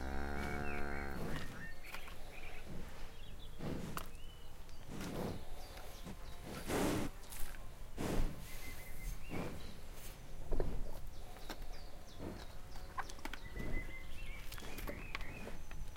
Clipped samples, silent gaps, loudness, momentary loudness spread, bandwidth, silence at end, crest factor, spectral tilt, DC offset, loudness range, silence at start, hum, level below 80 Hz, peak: under 0.1%; none; -47 LUFS; 11 LU; 16.5 kHz; 0 s; 20 dB; -5 dB/octave; under 0.1%; 6 LU; 0 s; none; -46 dBFS; -20 dBFS